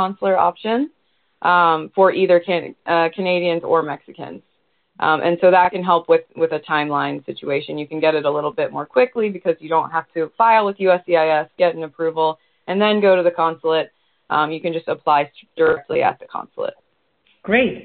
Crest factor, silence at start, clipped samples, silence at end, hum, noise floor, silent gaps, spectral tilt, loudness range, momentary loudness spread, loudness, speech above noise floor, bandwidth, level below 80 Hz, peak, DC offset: 18 dB; 0 s; under 0.1%; 0 s; none; -64 dBFS; none; -3 dB/octave; 3 LU; 12 LU; -18 LUFS; 46 dB; 4.6 kHz; -62 dBFS; 0 dBFS; under 0.1%